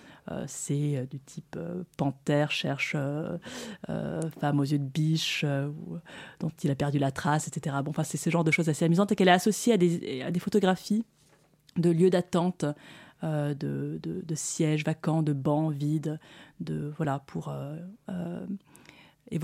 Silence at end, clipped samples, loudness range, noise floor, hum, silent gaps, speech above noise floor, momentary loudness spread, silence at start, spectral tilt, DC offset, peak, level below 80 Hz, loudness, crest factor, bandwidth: 0 s; under 0.1%; 6 LU; -63 dBFS; none; none; 34 dB; 15 LU; 0.05 s; -5.5 dB/octave; under 0.1%; -8 dBFS; -66 dBFS; -29 LUFS; 22 dB; 15.5 kHz